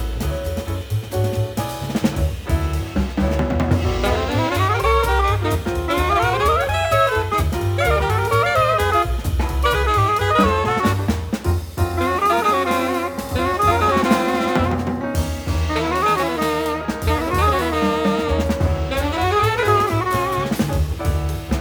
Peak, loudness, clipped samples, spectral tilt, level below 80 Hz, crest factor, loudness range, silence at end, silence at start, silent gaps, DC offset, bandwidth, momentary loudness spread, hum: -4 dBFS; -19 LUFS; under 0.1%; -6 dB/octave; -28 dBFS; 16 dB; 3 LU; 0 s; 0 s; none; under 0.1%; over 20 kHz; 6 LU; none